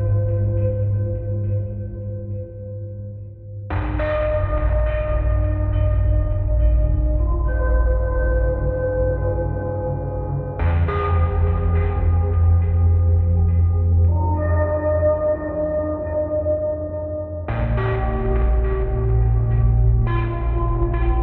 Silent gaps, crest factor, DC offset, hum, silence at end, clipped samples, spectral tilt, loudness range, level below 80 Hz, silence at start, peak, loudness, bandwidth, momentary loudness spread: none; 12 dB; under 0.1%; none; 0 s; under 0.1%; -9 dB/octave; 6 LU; -22 dBFS; 0 s; -6 dBFS; -21 LUFS; 4 kHz; 9 LU